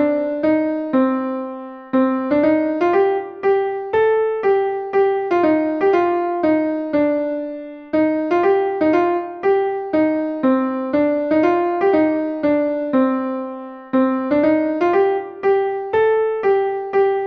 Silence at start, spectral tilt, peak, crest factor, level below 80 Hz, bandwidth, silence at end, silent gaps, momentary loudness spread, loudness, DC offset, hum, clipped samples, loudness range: 0 s; -8 dB/octave; -4 dBFS; 14 dB; -58 dBFS; 6.2 kHz; 0 s; none; 5 LU; -18 LUFS; under 0.1%; none; under 0.1%; 1 LU